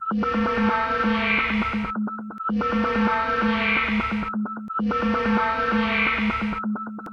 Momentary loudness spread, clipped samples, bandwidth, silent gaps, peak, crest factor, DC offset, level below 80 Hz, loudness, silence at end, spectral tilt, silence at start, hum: 8 LU; under 0.1%; 6.6 kHz; none; -8 dBFS; 16 dB; under 0.1%; -44 dBFS; -23 LUFS; 0 s; -6.5 dB/octave; 0 s; none